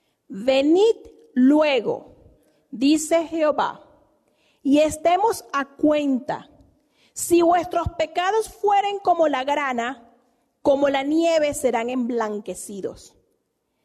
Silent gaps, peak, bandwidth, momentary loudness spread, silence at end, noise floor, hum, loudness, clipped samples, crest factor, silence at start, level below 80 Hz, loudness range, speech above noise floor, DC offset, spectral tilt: none; -8 dBFS; 13.5 kHz; 13 LU; 0.85 s; -72 dBFS; none; -21 LUFS; under 0.1%; 14 dB; 0.3 s; -54 dBFS; 2 LU; 52 dB; under 0.1%; -4 dB/octave